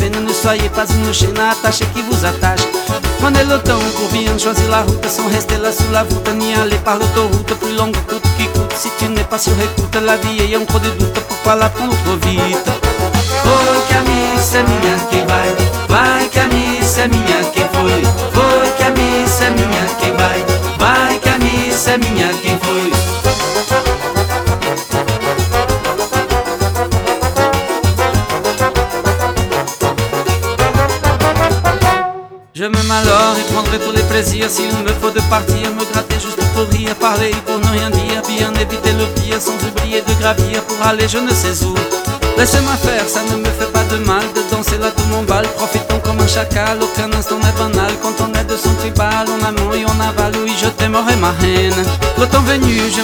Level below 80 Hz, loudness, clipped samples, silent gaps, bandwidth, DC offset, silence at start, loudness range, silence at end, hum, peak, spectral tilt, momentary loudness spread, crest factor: -24 dBFS; -14 LUFS; under 0.1%; none; over 20 kHz; under 0.1%; 0 s; 3 LU; 0 s; none; 0 dBFS; -4.5 dB/octave; 5 LU; 14 dB